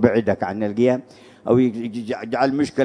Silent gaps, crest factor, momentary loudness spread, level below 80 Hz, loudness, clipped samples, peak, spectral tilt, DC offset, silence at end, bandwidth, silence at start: none; 20 dB; 10 LU; -56 dBFS; -21 LUFS; under 0.1%; 0 dBFS; -7.5 dB/octave; under 0.1%; 0 s; 10 kHz; 0 s